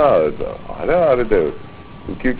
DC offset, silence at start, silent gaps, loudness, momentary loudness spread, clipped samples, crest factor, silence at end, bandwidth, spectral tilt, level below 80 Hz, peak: 0.8%; 0 s; none; -18 LUFS; 20 LU; under 0.1%; 16 dB; 0 s; 4 kHz; -10.5 dB/octave; -36 dBFS; -2 dBFS